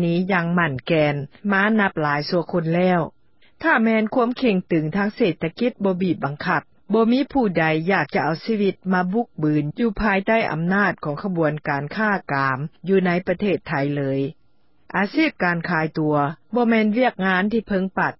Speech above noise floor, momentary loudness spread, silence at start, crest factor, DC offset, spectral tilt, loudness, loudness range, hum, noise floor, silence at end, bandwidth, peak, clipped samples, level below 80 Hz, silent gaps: 44 dB; 5 LU; 0 s; 16 dB; 0.2%; -11 dB/octave; -21 LUFS; 2 LU; none; -65 dBFS; 0.05 s; 5.8 kHz; -4 dBFS; under 0.1%; -50 dBFS; none